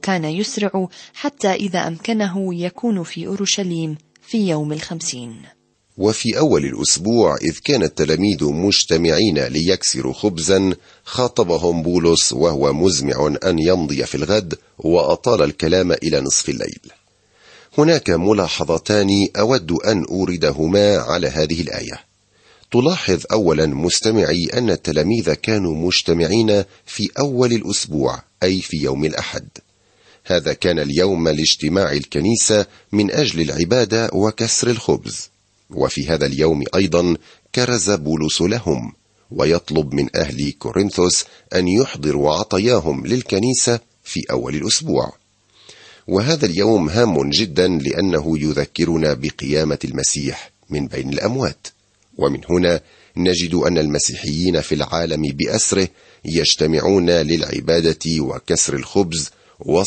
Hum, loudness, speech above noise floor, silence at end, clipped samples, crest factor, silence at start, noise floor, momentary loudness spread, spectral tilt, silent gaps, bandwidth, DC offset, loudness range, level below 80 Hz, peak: none; -18 LUFS; 38 dB; 0 s; under 0.1%; 18 dB; 0.05 s; -55 dBFS; 9 LU; -4 dB/octave; none; 8.8 kHz; under 0.1%; 4 LU; -42 dBFS; 0 dBFS